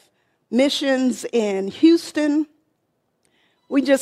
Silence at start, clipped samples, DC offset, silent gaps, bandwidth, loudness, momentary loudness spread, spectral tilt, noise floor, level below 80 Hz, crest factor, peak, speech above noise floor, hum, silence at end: 0.5 s; under 0.1%; under 0.1%; none; 13 kHz; -20 LUFS; 8 LU; -4 dB/octave; -71 dBFS; -70 dBFS; 16 dB; -4 dBFS; 52 dB; none; 0 s